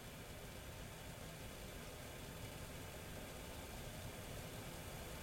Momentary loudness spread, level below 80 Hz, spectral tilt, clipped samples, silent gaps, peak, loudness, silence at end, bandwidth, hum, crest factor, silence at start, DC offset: 2 LU; -58 dBFS; -4 dB/octave; under 0.1%; none; -38 dBFS; -51 LUFS; 0 s; 16.5 kHz; none; 14 dB; 0 s; under 0.1%